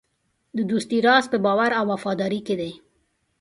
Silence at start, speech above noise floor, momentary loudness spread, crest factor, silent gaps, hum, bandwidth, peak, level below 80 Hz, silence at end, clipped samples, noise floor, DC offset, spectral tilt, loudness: 0.55 s; 50 dB; 11 LU; 18 dB; none; none; 11.5 kHz; -6 dBFS; -64 dBFS; 0.65 s; under 0.1%; -71 dBFS; under 0.1%; -5 dB/octave; -22 LUFS